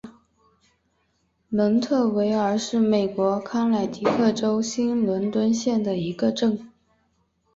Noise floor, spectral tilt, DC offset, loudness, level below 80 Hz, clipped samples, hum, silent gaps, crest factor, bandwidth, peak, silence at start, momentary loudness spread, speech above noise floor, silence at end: -69 dBFS; -6 dB/octave; under 0.1%; -23 LUFS; -62 dBFS; under 0.1%; none; none; 16 dB; 7.8 kHz; -6 dBFS; 0.05 s; 3 LU; 47 dB; 0.9 s